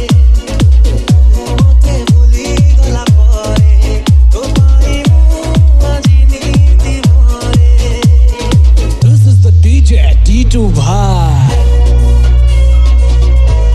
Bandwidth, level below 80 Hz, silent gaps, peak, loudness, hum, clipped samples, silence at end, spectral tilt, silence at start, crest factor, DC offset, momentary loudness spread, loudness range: 10.5 kHz; -8 dBFS; none; 0 dBFS; -9 LUFS; none; under 0.1%; 0 s; -6.5 dB/octave; 0 s; 6 dB; under 0.1%; 3 LU; 1 LU